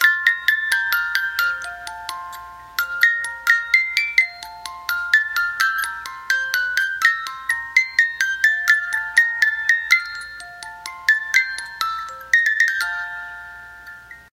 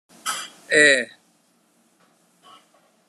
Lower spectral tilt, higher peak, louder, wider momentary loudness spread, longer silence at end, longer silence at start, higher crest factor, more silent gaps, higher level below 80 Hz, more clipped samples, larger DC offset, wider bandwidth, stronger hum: second, 2 dB/octave vs -1 dB/octave; about the same, 0 dBFS vs -2 dBFS; about the same, -18 LUFS vs -18 LUFS; about the same, 17 LU vs 17 LU; second, 0.1 s vs 2.05 s; second, 0 s vs 0.25 s; about the same, 20 dB vs 22 dB; neither; first, -58 dBFS vs -88 dBFS; neither; neither; first, 17 kHz vs 14 kHz; neither